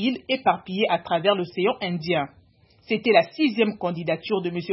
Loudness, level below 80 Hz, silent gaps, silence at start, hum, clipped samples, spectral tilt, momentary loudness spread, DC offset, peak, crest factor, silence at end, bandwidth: -23 LUFS; -64 dBFS; none; 0 s; none; under 0.1%; -9.5 dB/octave; 8 LU; under 0.1%; -4 dBFS; 20 dB; 0 s; 5.8 kHz